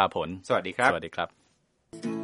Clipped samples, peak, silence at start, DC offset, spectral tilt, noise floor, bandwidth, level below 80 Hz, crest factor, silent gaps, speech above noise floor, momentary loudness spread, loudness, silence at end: under 0.1%; -6 dBFS; 0 s; under 0.1%; -4.5 dB/octave; -69 dBFS; 11.5 kHz; -62 dBFS; 24 dB; none; 42 dB; 11 LU; -28 LUFS; 0 s